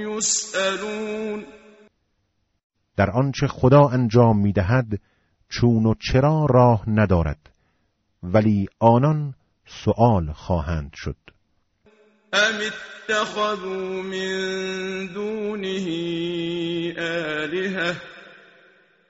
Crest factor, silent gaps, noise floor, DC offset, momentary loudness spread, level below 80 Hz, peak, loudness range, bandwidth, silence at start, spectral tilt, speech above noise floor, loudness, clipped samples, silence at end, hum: 20 dB; 2.64-2.70 s; -71 dBFS; under 0.1%; 14 LU; -42 dBFS; -4 dBFS; 7 LU; 8 kHz; 0 s; -5.5 dB/octave; 50 dB; -21 LUFS; under 0.1%; 0.8 s; none